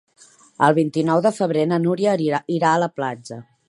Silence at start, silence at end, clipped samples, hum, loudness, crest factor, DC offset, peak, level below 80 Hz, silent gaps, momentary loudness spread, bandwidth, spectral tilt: 0.6 s; 0.25 s; under 0.1%; none; -20 LUFS; 18 dB; under 0.1%; -2 dBFS; -70 dBFS; none; 10 LU; 11.5 kHz; -6.5 dB/octave